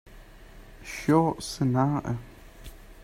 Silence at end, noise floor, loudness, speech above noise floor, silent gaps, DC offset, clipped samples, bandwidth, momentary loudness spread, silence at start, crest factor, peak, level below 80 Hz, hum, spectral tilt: 0 s; -48 dBFS; -26 LUFS; 23 dB; none; under 0.1%; under 0.1%; 16 kHz; 25 LU; 0.05 s; 20 dB; -10 dBFS; -48 dBFS; none; -6.5 dB/octave